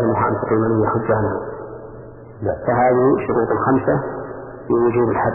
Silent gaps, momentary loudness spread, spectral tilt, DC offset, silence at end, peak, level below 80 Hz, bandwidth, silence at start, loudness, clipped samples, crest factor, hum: none; 17 LU; -13.5 dB/octave; under 0.1%; 0 s; -4 dBFS; -46 dBFS; 2.9 kHz; 0 s; -18 LUFS; under 0.1%; 14 dB; none